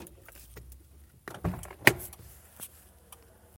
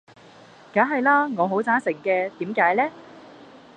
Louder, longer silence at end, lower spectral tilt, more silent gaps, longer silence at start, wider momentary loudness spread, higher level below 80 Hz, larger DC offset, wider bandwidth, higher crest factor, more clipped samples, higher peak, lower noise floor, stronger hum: second, -28 LUFS vs -22 LUFS; first, 0.95 s vs 0.5 s; second, -3.5 dB/octave vs -7 dB/octave; neither; second, 0 s vs 0.75 s; first, 27 LU vs 7 LU; first, -52 dBFS vs -74 dBFS; neither; first, 17 kHz vs 9.4 kHz; first, 36 dB vs 20 dB; neither; first, 0 dBFS vs -4 dBFS; first, -56 dBFS vs -48 dBFS; neither